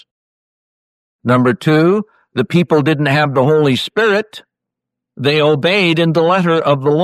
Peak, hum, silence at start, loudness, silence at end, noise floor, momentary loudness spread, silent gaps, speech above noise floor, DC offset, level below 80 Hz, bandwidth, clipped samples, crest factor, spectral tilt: -2 dBFS; none; 1.25 s; -13 LUFS; 0 s; -81 dBFS; 7 LU; none; 69 dB; under 0.1%; -58 dBFS; 13.5 kHz; under 0.1%; 12 dB; -7 dB/octave